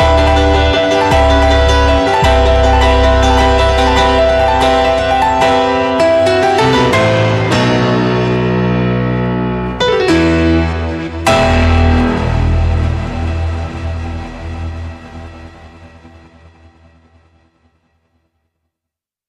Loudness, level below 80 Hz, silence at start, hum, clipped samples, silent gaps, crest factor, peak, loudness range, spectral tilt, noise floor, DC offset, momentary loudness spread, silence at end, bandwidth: -12 LUFS; -20 dBFS; 0 s; none; under 0.1%; none; 10 dB; -2 dBFS; 13 LU; -6 dB/octave; -83 dBFS; under 0.1%; 12 LU; 3.2 s; 12.5 kHz